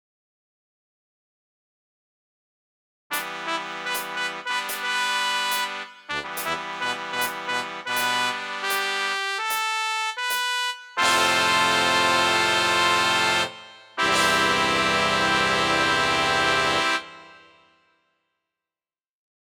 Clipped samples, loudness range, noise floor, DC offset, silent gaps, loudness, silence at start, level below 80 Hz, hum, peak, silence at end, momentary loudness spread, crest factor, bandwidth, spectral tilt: under 0.1%; 10 LU; under -90 dBFS; under 0.1%; none; -22 LUFS; 3.1 s; -56 dBFS; none; -4 dBFS; 2.1 s; 10 LU; 22 dB; over 20 kHz; -1.5 dB/octave